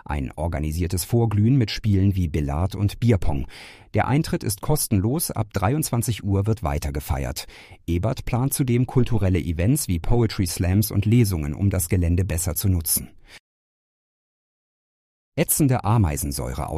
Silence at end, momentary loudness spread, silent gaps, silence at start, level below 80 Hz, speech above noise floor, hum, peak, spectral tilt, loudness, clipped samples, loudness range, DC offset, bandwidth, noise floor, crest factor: 0 s; 8 LU; 13.40-15.32 s; 0.1 s; -34 dBFS; over 68 dB; none; -6 dBFS; -6 dB/octave; -23 LUFS; under 0.1%; 4 LU; under 0.1%; 15.5 kHz; under -90 dBFS; 16 dB